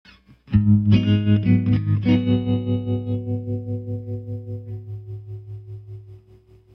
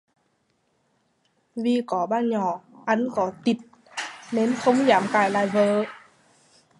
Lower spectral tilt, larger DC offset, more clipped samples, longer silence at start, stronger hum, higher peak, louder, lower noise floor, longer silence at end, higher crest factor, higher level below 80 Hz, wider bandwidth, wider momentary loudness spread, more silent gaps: first, -10 dB/octave vs -5.5 dB/octave; neither; neither; second, 0.5 s vs 1.55 s; neither; about the same, -4 dBFS vs -4 dBFS; first, -21 LUFS vs -24 LUFS; second, -51 dBFS vs -69 dBFS; second, 0.55 s vs 0.8 s; about the same, 18 dB vs 20 dB; first, -44 dBFS vs -72 dBFS; second, 5.4 kHz vs 11.5 kHz; first, 19 LU vs 14 LU; neither